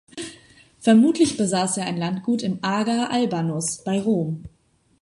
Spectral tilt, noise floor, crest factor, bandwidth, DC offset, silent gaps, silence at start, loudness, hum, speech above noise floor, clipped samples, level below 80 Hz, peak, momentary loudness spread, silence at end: -5 dB/octave; -51 dBFS; 18 dB; 11.5 kHz; under 0.1%; none; 0.15 s; -22 LUFS; none; 30 dB; under 0.1%; -60 dBFS; -4 dBFS; 13 LU; 0.55 s